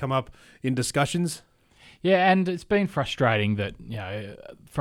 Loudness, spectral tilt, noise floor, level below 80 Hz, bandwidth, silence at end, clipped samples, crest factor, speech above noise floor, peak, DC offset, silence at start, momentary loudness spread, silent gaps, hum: -25 LUFS; -5.5 dB/octave; -55 dBFS; -54 dBFS; 16 kHz; 0 s; under 0.1%; 18 dB; 30 dB; -8 dBFS; under 0.1%; 0 s; 15 LU; none; none